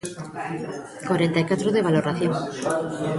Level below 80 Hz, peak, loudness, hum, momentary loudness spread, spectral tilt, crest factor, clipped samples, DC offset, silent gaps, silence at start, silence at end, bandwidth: -60 dBFS; -8 dBFS; -24 LUFS; none; 12 LU; -6 dB/octave; 16 dB; under 0.1%; under 0.1%; none; 0.05 s; 0 s; 11.5 kHz